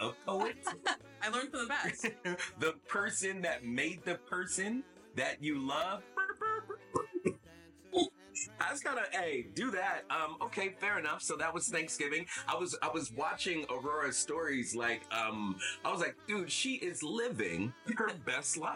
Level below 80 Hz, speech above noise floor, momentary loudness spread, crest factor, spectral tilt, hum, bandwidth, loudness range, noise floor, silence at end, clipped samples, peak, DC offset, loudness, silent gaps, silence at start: -72 dBFS; 22 dB; 4 LU; 18 dB; -2.5 dB/octave; none; 16.5 kHz; 2 LU; -59 dBFS; 0 s; under 0.1%; -20 dBFS; under 0.1%; -36 LUFS; none; 0 s